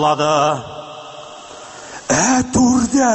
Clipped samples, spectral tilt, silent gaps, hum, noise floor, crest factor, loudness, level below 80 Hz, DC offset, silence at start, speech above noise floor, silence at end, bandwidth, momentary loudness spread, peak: under 0.1%; -4 dB/octave; none; none; -35 dBFS; 14 dB; -15 LUFS; -42 dBFS; under 0.1%; 0 s; 21 dB; 0 s; 8.6 kHz; 20 LU; -4 dBFS